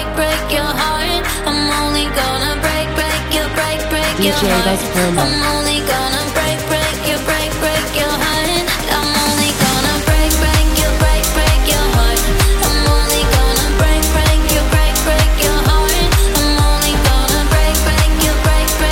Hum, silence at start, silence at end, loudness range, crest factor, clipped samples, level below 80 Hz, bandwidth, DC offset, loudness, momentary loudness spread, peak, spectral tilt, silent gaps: none; 0 s; 0 s; 2 LU; 12 dB; under 0.1%; -18 dBFS; 17 kHz; under 0.1%; -14 LUFS; 3 LU; 0 dBFS; -3.5 dB/octave; none